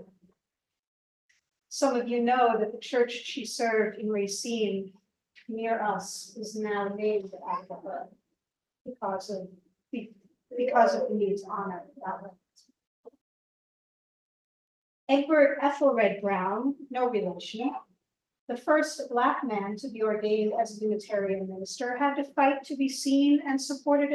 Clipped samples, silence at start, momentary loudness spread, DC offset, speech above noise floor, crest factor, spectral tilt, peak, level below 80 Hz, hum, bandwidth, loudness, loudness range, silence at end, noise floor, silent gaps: under 0.1%; 0 s; 15 LU; under 0.1%; 61 dB; 22 dB; -4.5 dB/octave; -8 dBFS; -80 dBFS; none; 12.5 kHz; -28 LUFS; 9 LU; 0 s; -88 dBFS; 0.87-1.29 s, 8.81-8.85 s, 12.87-13.04 s, 13.21-15.07 s, 18.39-18.47 s